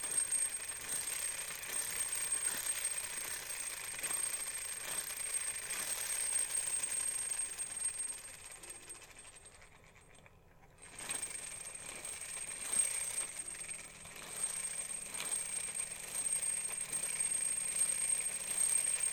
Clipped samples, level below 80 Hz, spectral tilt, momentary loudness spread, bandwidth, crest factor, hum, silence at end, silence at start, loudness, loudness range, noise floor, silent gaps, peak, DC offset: under 0.1%; -68 dBFS; 1 dB/octave; 13 LU; 17 kHz; 18 dB; none; 0 s; 0 s; -36 LUFS; 10 LU; -62 dBFS; none; -22 dBFS; under 0.1%